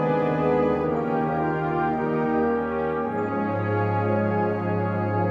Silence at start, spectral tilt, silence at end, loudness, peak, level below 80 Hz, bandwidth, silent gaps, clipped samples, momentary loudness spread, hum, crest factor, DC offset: 0 s; -10 dB/octave; 0 s; -24 LUFS; -10 dBFS; -50 dBFS; 5.8 kHz; none; under 0.1%; 4 LU; none; 14 dB; under 0.1%